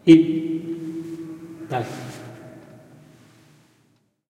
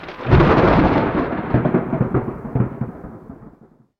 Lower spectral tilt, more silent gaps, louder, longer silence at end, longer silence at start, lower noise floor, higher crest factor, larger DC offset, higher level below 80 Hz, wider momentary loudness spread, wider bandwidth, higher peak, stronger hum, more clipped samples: second, -7 dB/octave vs -9.5 dB/octave; neither; second, -23 LUFS vs -18 LUFS; first, 1.7 s vs 0.5 s; about the same, 0.05 s vs 0 s; first, -64 dBFS vs -50 dBFS; first, 24 dB vs 18 dB; neither; second, -64 dBFS vs -30 dBFS; first, 25 LU vs 17 LU; first, 9.2 kHz vs 6.4 kHz; about the same, 0 dBFS vs -2 dBFS; neither; neither